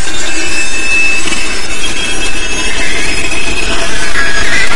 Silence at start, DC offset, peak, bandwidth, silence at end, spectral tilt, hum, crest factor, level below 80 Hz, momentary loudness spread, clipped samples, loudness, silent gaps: 0 s; 50%; 0 dBFS; 12 kHz; 0 s; -1.5 dB/octave; none; 14 dB; -26 dBFS; 5 LU; 2%; -13 LUFS; none